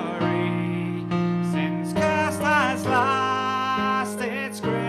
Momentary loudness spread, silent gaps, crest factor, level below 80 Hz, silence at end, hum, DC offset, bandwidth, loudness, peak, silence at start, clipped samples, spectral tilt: 6 LU; none; 14 dB; -56 dBFS; 0 s; none; under 0.1%; 14 kHz; -24 LUFS; -10 dBFS; 0 s; under 0.1%; -5.5 dB/octave